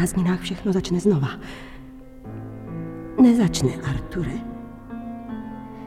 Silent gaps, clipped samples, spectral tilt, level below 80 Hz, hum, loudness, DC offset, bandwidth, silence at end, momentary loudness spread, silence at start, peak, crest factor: none; under 0.1%; -6.5 dB/octave; -42 dBFS; none; -23 LUFS; under 0.1%; 14.5 kHz; 0 s; 21 LU; 0 s; -6 dBFS; 18 dB